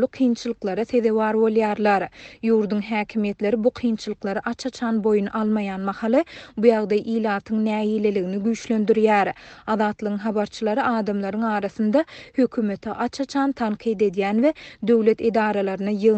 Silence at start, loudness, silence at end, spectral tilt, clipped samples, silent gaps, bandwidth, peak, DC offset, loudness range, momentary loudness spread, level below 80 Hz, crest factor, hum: 0 s; -22 LUFS; 0 s; -6.5 dB/octave; under 0.1%; none; 8.4 kHz; -4 dBFS; under 0.1%; 2 LU; 8 LU; -58 dBFS; 18 dB; none